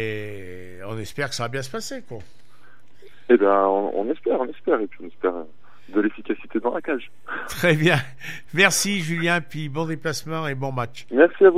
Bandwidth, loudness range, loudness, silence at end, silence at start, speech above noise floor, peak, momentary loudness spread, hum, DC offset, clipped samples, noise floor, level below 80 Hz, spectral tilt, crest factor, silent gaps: 16 kHz; 5 LU; -23 LUFS; 0 s; 0 s; 33 dB; -2 dBFS; 17 LU; none; 2%; under 0.1%; -55 dBFS; -60 dBFS; -4.5 dB/octave; 22 dB; none